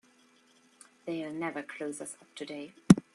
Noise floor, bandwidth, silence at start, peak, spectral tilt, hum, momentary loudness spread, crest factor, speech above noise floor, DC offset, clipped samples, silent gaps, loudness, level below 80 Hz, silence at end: -64 dBFS; 12 kHz; 1.05 s; -4 dBFS; -6 dB/octave; none; 20 LU; 28 dB; 26 dB; under 0.1%; under 0.1%; none; -33 LUFS; -62 dBFS; 0.15 s